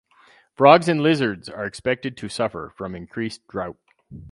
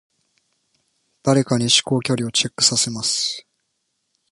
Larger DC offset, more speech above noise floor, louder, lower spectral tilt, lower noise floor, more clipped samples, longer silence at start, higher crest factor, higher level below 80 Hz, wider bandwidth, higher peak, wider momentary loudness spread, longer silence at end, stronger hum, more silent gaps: neither; second, 34 dB vs 54 dB; second, -21 LUFS vs -18 LUFS; first, -6 dB/octave vs -3 dB/octave; second, -55 dBFS vs -73 dBFS; neither; second, 0.6 s vs 1.25 s; about the same, 22 dB vs 22 dB; first, -54 dBFS vs -60 dBFS; about the same, 11.5 kHz vs 11.5 kHz; about the same, 0 dBFS vs 0 dBFS; first, 18 LU vs 8 LU; second, 0.05 s vs 0.9 s; neither; neither